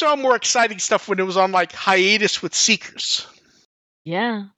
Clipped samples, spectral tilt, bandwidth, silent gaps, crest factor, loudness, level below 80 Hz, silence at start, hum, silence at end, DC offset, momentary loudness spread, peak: under 0.1%; -2 dB/octave; 9 kHz; 3.65-4.05 s; 18 dB; -18 LUFS; -70 dBFS; 0 s; none; 0.1 s; under 0.1%; 7 LU; -2 dBFS